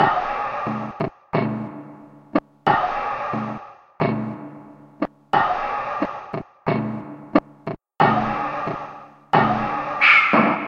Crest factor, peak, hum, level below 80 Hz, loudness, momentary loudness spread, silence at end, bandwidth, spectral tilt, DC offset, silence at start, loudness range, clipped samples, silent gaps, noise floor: 22 dB; -2 dBFS; none; -52 dBFS; -21 LUFS; 17 LU; 0 s; 7.6 kHz; -7 dB/octave; under 0.1%; 0 s; 6 LU; under 0.1%; none; -43 dBFS